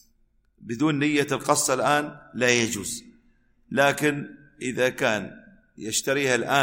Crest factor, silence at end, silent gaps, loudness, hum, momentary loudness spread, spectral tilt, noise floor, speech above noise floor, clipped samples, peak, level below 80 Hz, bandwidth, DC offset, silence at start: 20 dB; 0 s; none; -24 LUFS; none; 14 LU; -3.5 dB/octave; -64 dBFS; 40 dB; under 0.1%; -6 dBFS; -60 dBFS; 16.5 kHz; under 0.1%; 0.6 s